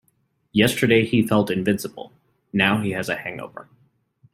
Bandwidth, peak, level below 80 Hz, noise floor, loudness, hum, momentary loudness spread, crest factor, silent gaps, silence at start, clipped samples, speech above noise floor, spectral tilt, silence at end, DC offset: 16 kHz; -2 dBFS; -58 dBFS; -67 dBFS; -21 LUFS; none; 16 LU; 20 dB; none; 0.55 s; under 0.1%; 46 dB; -5.5 dB/octave; 0.7 s; under 0.1%